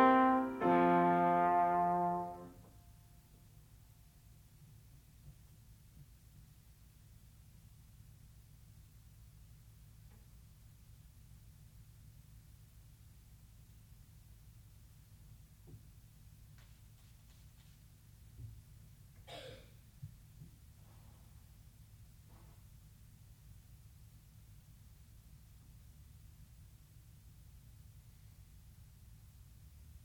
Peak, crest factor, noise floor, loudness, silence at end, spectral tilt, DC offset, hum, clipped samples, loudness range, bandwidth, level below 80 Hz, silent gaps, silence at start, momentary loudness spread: -16 dBFS; 24 dB; -62 dBFS; -32 LUFS; 9.6 s; -7 dB/octave; under 0.1%; none; under 0.1%; 24 LU; over 20 kHz; -62 dBFS; none; 0 s; 29 LU